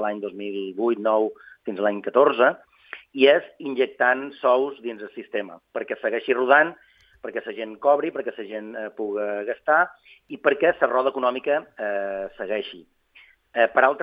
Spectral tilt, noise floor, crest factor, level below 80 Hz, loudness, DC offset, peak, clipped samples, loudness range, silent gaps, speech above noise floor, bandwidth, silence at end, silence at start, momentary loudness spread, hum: -7 dB/octave; -55 dBFS; 20 dB; -70 dBFS; -23 LUFS; under 0.1%; -2 dBFS; under 0.1%; 4 LU; none; 32 dB; 5.2 kHz; 0 s; 0 s; 16 LU; none